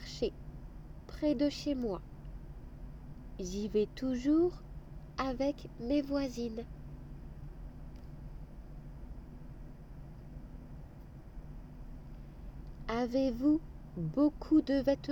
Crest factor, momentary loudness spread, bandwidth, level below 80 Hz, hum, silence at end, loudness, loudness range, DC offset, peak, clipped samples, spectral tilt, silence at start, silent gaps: 18 dB; 21 LU; 16 kHz; -48 dBFS; none; 0 s; -34 LUFS; 17 LU; under 0.1%; -18 dBFS; under 0.1%; -6.5 dB/octave; 0 s; none